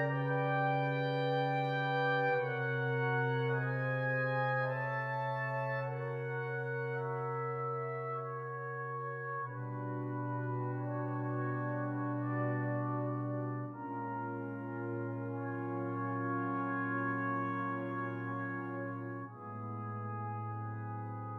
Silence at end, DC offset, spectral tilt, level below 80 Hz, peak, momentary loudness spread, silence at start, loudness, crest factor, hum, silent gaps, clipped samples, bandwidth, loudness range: 0 s; under 0.1%; -9 dB/octave; -78 dBFS; -22 dBFS; 8 LU; 0 s; -37 LUFS; 14 dB; none; none; under 0.1%; 5.2 kHz; 6 LU